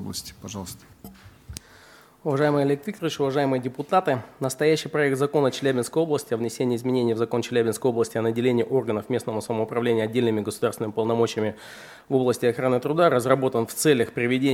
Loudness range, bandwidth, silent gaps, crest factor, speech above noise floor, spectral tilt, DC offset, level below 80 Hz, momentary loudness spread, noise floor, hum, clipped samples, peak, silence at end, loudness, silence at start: 3 LU; 16.5 kHz; none; 20 dB; 28 dB; -5.5 dB/octave; under 0.1%; -60 dBFS; 12 LU; -51 dBFS; none; under 0.1%; -4 dBFS; 0 s; -24 LUFS; 0 s